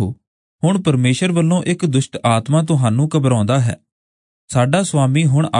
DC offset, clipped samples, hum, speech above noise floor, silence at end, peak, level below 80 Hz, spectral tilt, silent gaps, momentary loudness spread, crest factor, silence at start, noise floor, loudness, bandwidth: under 0.1%; under 0.1%; none; over 75 dB; 0 s; -2 dBFS; -56 dBFS; -6 dB/octave; 0.27-0.59 s, 3.92-4.48 s; 5 LU; 14 dB; 0 s; under -90 dBFS; -16 LUFS; 11 kHz